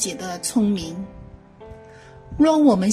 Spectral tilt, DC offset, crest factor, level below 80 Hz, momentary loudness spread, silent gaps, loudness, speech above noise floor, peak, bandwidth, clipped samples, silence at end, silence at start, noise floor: -5 dB/octave; under 0.1%; 16 dB; -46 dBFS; 22 LU; none; -20 LUFS; 24 dB; -6 dBFS; 15.5 kHz; under 0.1%; 0 s; 0 s; -44 dBFS